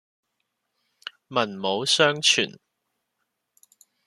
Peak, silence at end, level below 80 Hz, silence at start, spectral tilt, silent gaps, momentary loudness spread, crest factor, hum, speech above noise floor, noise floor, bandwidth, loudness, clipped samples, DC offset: -4 dBFS; 1.55 s; -76 dBFS; 1.3 s; -2 dB/octave; none; 23 LU; 24 dB; none; 56 dB; -79 dBFS; 13.5 kHz; -22 LUFS; under 0.1%; under 0.1%